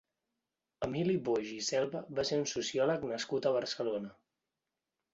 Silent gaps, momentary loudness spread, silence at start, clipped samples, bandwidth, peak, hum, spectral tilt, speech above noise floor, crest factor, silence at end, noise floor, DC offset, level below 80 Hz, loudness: none; 6 LU; 0.8 s; under 0.1%; 8 kHz; -18 dBFS; none; -4.5 dB/octave; 56 dB; 18 dB; 1 s; -89 dBFS; under 0.1%; -70 dBFS; -34 LUFS